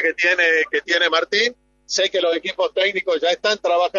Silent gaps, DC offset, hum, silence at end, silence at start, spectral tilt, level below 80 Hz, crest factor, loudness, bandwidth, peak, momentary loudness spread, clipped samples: none; under 0.1%; none; 0 s; 0 s; -1 dB/octave; -64 dBFS; 16 dB; -18 LUFS; 7.8 kHz; -4 dBFS; 6 LU; under 0.1%